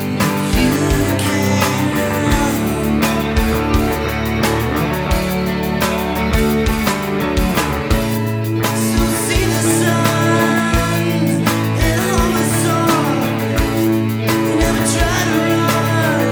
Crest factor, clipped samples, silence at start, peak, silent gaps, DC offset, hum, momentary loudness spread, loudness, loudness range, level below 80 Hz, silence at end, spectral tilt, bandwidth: 14 dB; under 0.1%; 0 s; 0 dBFS; none; under 0.1%; none; 3 LU; -16 LUFS; 2 LU; -26 dBFS; 0 s; -5 dB/octave; over 20 kHz